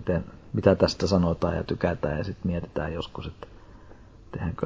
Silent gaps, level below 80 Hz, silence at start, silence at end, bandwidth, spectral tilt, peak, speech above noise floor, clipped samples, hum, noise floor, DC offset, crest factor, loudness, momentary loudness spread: none; -40 dBFS; 0 s; 0 s; 7.8 kHz; -7 dB/octave; -4 dBFS; 22 dB; under 0.1%; none; -48 dBFS; under 0.1%; 22 dB; -27 LUFS; 17 LU